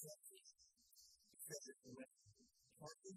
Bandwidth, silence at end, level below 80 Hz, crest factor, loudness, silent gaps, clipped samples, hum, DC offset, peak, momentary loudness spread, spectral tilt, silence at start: 15.5 kHz; 0 s; under -90 dBFS; 22 dB; -59 LUFS; none; under 0.1%; none; under 0.1%; -38 dBFS; 14 LU; -3 dB/octave; 0 s